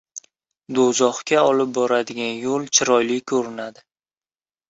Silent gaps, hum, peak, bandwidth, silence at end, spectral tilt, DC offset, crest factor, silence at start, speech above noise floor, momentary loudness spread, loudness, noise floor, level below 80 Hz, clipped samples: none; none; -2 dBFS; 8 kHz; 1 s; -2.5 dB/octave; under 0.1%; 20 dB; 0.15 s; over 70 dB; 15 LU; -20 LUFS; under -90 dBFS; -66 dBFS; under 0.1%